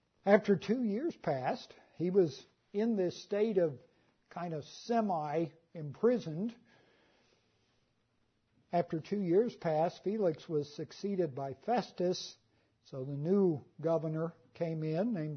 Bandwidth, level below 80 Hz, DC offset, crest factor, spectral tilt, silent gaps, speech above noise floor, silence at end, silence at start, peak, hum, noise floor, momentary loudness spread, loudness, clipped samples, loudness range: 6.6 kHz; -78 dBFS; under 0.1%; 24 dB; -7 dB/octave; none; 43 dB; 0 s; 0.25 s; -12 dBFS; none; -76 dBFS; 12 LU; -34 LUFS; under 0.1%; 4 LU